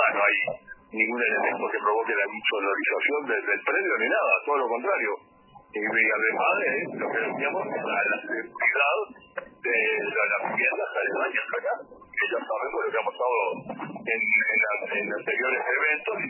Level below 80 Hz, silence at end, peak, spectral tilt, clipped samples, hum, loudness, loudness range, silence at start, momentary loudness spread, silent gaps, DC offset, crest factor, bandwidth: -74 dBFS; 0 s; -8 dBFS; -7 dB/octave; under 0.1%; none; -25 LUFS; 2 LU; 0 s; 9 LU; none; under 0.1%; 18 dB; 3.1 kHz